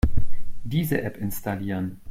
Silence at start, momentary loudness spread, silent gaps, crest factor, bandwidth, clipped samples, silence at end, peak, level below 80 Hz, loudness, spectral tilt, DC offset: 0.05 s; 10 LU; none; 14 dB; 16.5 kHz; under 0.1%; 0 s; -6 dBFS; -32 dBFS; -28 LUFS; -6.5 dB/octave; under 0.1%